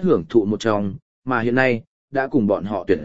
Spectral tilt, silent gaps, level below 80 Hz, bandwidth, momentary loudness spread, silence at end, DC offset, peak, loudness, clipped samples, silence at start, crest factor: -7 dB/octave; 1.02-1.22 s, 1.87-2.08 s; -50 dBFS; 7.8 kHz; 9 LU; 0 s; 0.9%; 0 dBFS; -21 LUFS; under 0.1%; 0 s; 20 dB